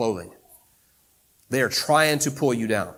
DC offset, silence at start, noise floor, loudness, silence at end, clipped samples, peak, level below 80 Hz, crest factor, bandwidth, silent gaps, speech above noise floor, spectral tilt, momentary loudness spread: under 0.1%; 0 s; -62 dBFS; -22 LUFS; 0.05 s; under 0.1%; -4 dBFS; -64 dBFS; 20 dB; 18 kHz; none; 39 dB; -3.5 dB/octave; 9 LU